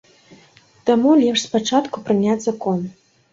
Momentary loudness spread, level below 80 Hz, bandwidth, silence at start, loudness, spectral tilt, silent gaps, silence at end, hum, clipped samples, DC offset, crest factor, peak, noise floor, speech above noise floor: 10 LU; -62 dBFS; 7.8 kHz; 0.85 s; -18 LUFS; -5 dB/octave; none; 0.4 s; none; under 0.1%; under 0.1%; 16 dB; -4 dBFS; -51 dBFS; 34 dB